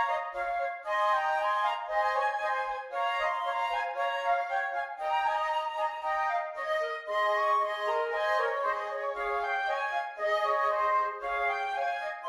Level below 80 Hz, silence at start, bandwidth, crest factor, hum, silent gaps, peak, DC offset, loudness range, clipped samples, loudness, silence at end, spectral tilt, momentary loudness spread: -66 dBFS; 0 s; 13.5 kHz; 14 dB; none; none; -16 dBFS; under 0.1%; 1 LU; under 0.1%; -30 LUFS; 0 s; -1 dB/octave; 5 LU